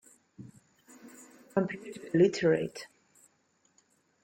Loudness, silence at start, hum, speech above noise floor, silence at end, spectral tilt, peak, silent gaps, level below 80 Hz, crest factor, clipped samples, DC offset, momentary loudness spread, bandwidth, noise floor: -30 LUFS; 0.4 s; none; 43 dB; 1.4 s; -6.5 dB/octave; -14 dBFS; none; -72 dBFS; 20 dB; under 0.1%; under 0.1%; 27 LU; 16.5 kHz; -71 dBFS